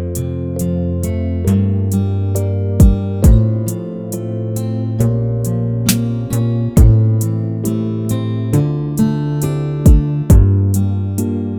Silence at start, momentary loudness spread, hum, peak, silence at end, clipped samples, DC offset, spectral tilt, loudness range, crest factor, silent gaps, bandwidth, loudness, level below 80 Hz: 0 s; 9 LU; none; 0 dBFS; 0 s; under 0.1%; under 0.1%; -7.5 dB/octave; 2 LU; 14 dB; none; over 20 kHz; -16 LUFS; -20 dBFS